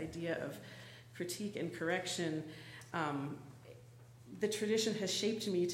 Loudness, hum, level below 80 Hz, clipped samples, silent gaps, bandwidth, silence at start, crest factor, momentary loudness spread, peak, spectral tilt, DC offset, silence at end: -38 LUFS; none; -72 dBFS; under 0.1%; none; 16 kHz; 0 s; 18 dB; 21 LU; -22 dBFS; -4 dB/octave; under 0.1%; 0 s